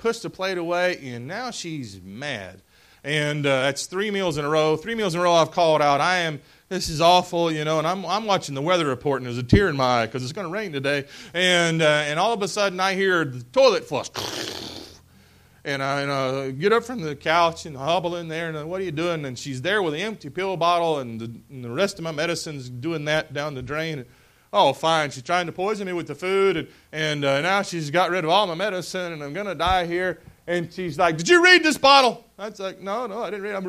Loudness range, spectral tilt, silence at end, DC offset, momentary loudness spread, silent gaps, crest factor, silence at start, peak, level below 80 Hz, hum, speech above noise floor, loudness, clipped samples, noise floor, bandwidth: 7 LU; -4 dB/octave; 0 s; under 0.1%; 13 LU; none; 22 dB; 0 s; -2 dBFS; -48 dBFS; none; 31 dB; -22 LUFS; under 0.1%; -53 dBFS; 15.5 kHz